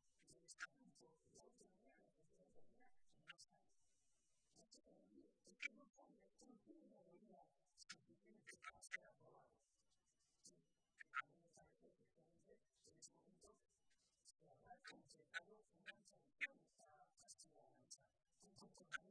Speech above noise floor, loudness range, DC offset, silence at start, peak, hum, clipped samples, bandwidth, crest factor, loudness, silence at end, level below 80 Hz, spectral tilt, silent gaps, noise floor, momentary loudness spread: 27 dB; 7 LU; under 0.1%; 0.05 s; -32 dBFS; none; under 0.1%; 9.6 kHz; 32 dB; -58 LUFS; 0 s; under -90 dBFS; -1.5 dB/octave; none; -88 dBFS; 16 LU